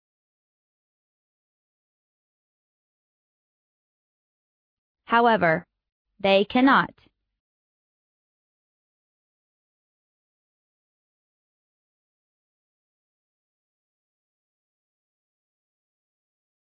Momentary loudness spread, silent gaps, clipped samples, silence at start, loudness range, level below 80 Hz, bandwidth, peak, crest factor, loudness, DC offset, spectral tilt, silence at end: 9 LU; 5.92-6.05 s; under 0.1%; 5.1 s; 5 LU; -70 dBFS; 5.2 kHz; -6 dBFS; 24 dB; -21 LUFS; under 0.1%; -8 dB/octave; 9.85 s